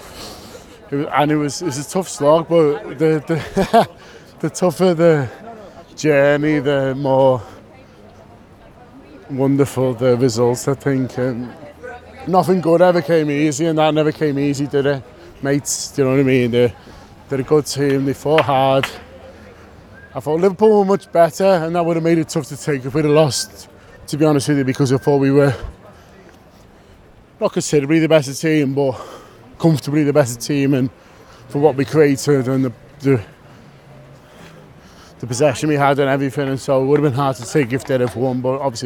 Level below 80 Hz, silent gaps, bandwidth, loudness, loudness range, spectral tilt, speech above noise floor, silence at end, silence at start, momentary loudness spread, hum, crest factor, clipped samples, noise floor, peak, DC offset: -48 dBFS; none; 18 kHz; -17 LUFS; 3 LU; -6 dB/octave; 30 dB; 0 s; 0 s; 12 LU; none; 18 dB; under 0.1%; -45 dBFS; 0 dBFS; under 0.1%